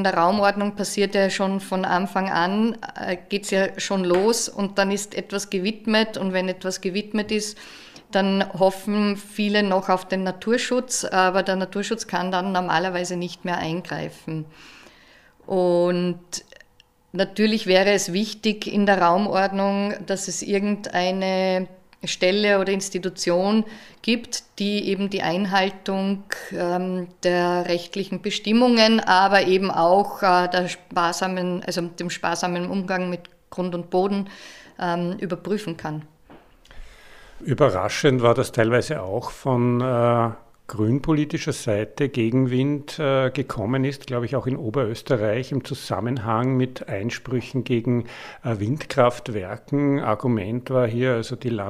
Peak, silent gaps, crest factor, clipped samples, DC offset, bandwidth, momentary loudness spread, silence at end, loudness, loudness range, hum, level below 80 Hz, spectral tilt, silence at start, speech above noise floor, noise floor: -2 dBFS; none; 20 dB; under 0.1%; under 0.1%; 15 kHz; 10 LU; 0 s; -22 LUFS; 6 LU; none; -54 dBFS; -5 dB/octave; 0 s; 35 dB; -58 dBFS